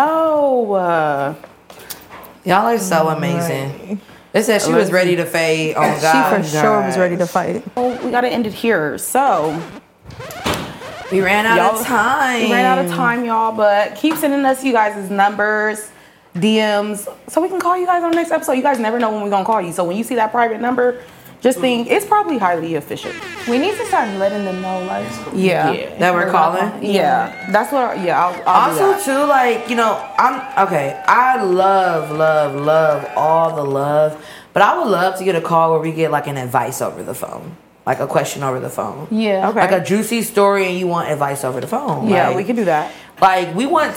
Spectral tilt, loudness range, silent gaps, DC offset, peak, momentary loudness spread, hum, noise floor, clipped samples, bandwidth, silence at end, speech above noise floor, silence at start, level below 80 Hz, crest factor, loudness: -5 dB/octave; 4 LU; none; under 0.1%; 0 dBFS; 10 LU; none; -38 dBFS; under 0.1%; 17 kHz; 0 s; 22 dB; 0 s; -56 dBFS; 16 dB; -16 LUFS